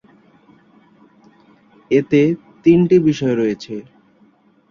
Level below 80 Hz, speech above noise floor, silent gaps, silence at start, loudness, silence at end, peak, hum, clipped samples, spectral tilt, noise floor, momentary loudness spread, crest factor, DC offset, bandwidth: -56 dBFS; 39 dB; none; 1.9 s; -16 LUFS; 0.9 s; -2 dBFS; none; under 0.1%; -8 dB/octave; -54 dBFS; 15 LU; 16 dB; under 0.1%; 7.2 kHz